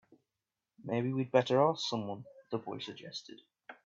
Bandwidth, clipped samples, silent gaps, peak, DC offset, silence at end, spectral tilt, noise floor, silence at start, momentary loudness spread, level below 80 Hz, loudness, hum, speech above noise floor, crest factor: 7.8 kHz; under 0.1%; none; -12 dBFS; under 0.1%; 0.1 s; -6 dB/octave; under -90 dBFS; 0.85 s; 21 LU; -80 dBFS; -34 LUFS; none; over 57 dB; 24 dB